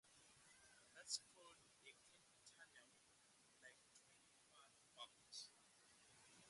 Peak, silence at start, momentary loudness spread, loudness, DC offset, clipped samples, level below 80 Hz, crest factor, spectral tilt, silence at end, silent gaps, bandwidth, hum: -32 dBFS; 0.05 s; 19 LU; -59 LUFS; under 0.1%; under 0.1%; under -90 dBFS; 32 dB; 0.5 dB/octave; 0 s; none; 11.5 kHz; none